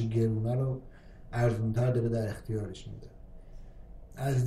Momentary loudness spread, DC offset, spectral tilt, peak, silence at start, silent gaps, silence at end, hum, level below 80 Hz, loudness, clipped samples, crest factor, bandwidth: 18 LU; under 0.1%; -8 dB/octave; -16 dBFS; 0 s; none; 0 s; none; -48 dBFS; -31 LUFS; under 0.1%; 16 dB; 13 kHz